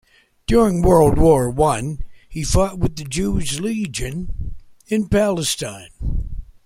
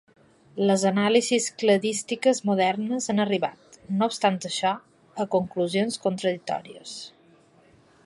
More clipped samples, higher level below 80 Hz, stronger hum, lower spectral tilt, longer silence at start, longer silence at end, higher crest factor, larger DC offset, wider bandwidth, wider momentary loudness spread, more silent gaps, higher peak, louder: neither; first, -28 dBFS vs -70 dBFS; neither; about the same, -5.5 dB/octave vs -4.5 dB/octave; about the same, 0.5 s vs 0.55 s; second, 0.15 s vs 1 s; about the same, 16 dB vs 20 dB; neither; first, 16.5 kHz vs 11.5 kHz; first, 17 LU vs 14 LU; neither; first, -2 dBFS vs -6 dBFS; first, -19 LUFS vs -25 LUFS